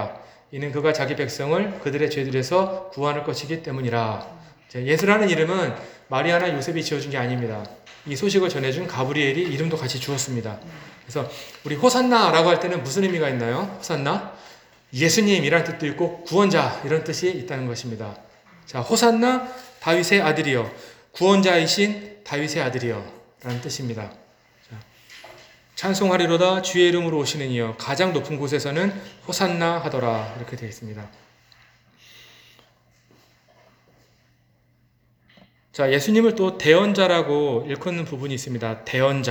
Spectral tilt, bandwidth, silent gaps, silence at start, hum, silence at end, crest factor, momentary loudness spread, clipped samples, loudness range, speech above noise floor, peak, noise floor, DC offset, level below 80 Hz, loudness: -4.5 dB/octave; over 20 kHz; none; 0 s; none; 0 s; 22 dB; 17 LU; under 0.1%; 7 LU; 40 dB; -2 dBFS; -62 dBFS; under 0.1%; -62 dBFS; -22 LUFS